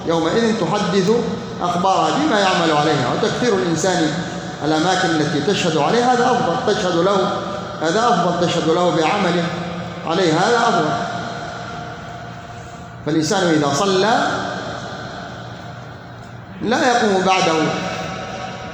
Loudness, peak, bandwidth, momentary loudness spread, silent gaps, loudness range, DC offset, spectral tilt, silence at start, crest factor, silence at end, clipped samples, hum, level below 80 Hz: -18 LUFS; -4 dBFS; 19 kHz; 16 LU; none; 4 LU; under 0.1%; -4.5 dB/octave; 0 s; 14 dB; 0 s; under 0.1%; none; -50 dBFS